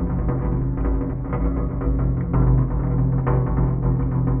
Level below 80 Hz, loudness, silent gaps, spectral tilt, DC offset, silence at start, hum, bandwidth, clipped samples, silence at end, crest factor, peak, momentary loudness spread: -24 dBFS; -22 LUFS; none; -12.5 dB/octave; under 0.1%; 0 s; none; 2.5 kHz; under 0.1%; 0 s; 14 dB; -6 dBFS; 5 LU